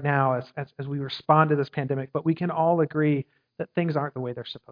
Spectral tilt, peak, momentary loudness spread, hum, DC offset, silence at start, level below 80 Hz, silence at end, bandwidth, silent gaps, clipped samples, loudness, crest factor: -9.5 dB/octave; -4 dBFS; 13 LU; none; under 0.1%; 0 s; -70 dBFS; 0 s; 5.2 kHz; none; under 0.1%; -25 LUFS; 22 dB